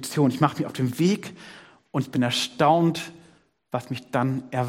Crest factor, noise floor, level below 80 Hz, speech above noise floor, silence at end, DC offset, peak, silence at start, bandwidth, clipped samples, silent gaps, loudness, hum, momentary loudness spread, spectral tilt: 20 dB; -58 dBFS; -66 dBFS; 34 dB; 0 s; under 0.1%; -4 dBFS; 0 s; 16.5 kHz; under 0.1%; none; -24 LUFS; none; 14 LU; -5.5 dB/octave